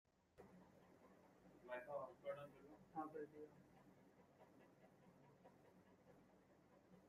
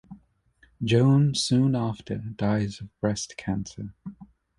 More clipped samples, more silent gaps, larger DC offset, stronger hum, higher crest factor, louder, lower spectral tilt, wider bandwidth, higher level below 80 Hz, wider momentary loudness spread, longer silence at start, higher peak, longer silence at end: neither; neither; neither; neither; first, 22 dB vs 16 dB; second, -55 LUFS vs -25 LUFS; about the same, -6.5 dB/octave vs -6 dB/octave; first, 13.5 kHz vs 11.5 kHz; second, -90 dBFS vs -54 dBFS; second, 15 LU vs 18 LU; about the same, 0.05 s vs 0.1 s; second, -38 dBFS vs -10 dBFS; second, 0 s vs 0.35 s